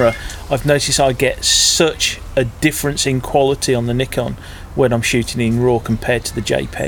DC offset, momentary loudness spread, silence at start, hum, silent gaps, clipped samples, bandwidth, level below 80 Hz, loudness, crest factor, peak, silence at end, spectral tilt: under 0.1%; 8 LU; 0 s; none; none; under 0.1%; 19.5 kHz; -34 dBFS; -16 LUFS; 16 dB; 0 dBFS; 0 s; -3.5 dB/octave